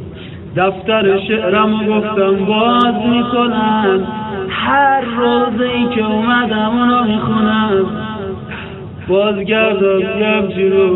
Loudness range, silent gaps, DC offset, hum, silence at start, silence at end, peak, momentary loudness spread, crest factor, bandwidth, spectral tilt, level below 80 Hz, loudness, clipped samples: 2 LU; none; under 0.1%; none; 0 s; 0 s; 0 dBFS; 11 LU; 14 dB; 4.1 kHz; -9 dB/octave; -46 dBFS; -14 LUFS; under 0.1%